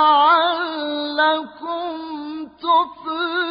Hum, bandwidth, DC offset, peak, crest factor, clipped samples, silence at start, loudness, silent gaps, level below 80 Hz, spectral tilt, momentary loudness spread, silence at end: none; 5.2 kHz; under 0.1%; -4 dBFS; 14 dB; under 0.1%; 0 s; -20 LUFS; none; -64 dBFS; -7 dB/octave; 15 LU; 0 s